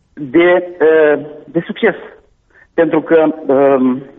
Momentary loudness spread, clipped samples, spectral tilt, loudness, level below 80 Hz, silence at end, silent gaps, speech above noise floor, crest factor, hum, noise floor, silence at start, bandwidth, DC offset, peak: 11 LU; under 0.1%; -4.5 dB/octave; -13 LUFS; -56 dBFS; 0.15 s; none; 37 dB; 12 dB; none; -50 dBFS; 0.15 s; 3.9 kHz; under 0.1%; -2 dBFS